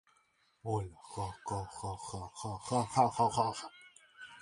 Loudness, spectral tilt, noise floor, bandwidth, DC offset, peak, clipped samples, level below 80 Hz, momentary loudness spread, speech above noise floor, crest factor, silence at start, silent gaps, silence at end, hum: -36 LUFS; -5 dB/octave; -73 dBFS; 11.5 kHz; under 0.1%; -14 dBFS; under 0.1%; -60 dBFS; 16 LU; 37 dB; 22 dB; 0.65 s; none; 0 s; none